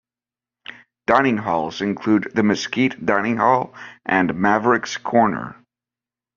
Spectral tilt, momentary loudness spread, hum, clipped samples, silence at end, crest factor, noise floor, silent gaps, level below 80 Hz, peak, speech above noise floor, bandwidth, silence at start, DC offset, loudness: -4 dB/octave; 15 LU; none; under 0.1%; 0.85 s; 20 dB; under -90 dBFS; none; -58 dBFS; 0 dBFS; over 71 dB; 7.2 kHz; 0.7 s; under 0.1%; -19 LUFS